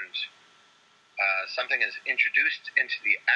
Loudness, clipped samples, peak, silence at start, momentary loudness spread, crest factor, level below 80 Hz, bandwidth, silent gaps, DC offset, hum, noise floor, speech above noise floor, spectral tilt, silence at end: -25 LUFS; under 0.1%; -8 dBFS; 0 s; 11 LU; 20 dB; under -90 dBFS; 9.6 kHz; none; under 0.1%; none; -61 dBFS; 34 dB; 0 dB/octave; 0 s